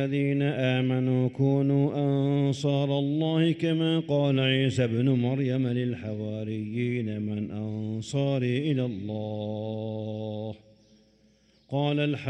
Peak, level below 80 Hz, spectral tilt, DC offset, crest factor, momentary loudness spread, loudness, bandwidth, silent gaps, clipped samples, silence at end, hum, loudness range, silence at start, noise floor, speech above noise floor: -12 dBFS; -66 dBFS; -7.5 dB/octave; under 0.1%; 14 dB; 9 LU; -27 LUFS; 9 kHz; none; under 0.1%; 0 s; none; 7 LU; 0 s; -62 dBFS; 36 dB